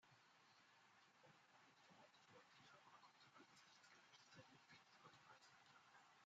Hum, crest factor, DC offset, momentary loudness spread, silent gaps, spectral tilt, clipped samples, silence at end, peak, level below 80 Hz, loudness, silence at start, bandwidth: none; 18 dB; under 0.1%; 2 LU; none; -1.5 dB/octave; under 0.1%; 0 s; -54 dBFS; under -90 dBFS; -69 LUFS; 0 s; 7.6 kHz